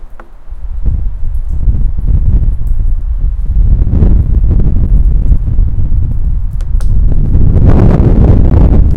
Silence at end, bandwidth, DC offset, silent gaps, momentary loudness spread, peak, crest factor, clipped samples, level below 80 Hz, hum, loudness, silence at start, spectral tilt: 0 s; 2.7 kHz; under 0.1%; none; 10 LU; 0 dBFS; 6 dB; 4%; -8 dBFS; none; -12 LUFS; 0 s; -11 dB/octave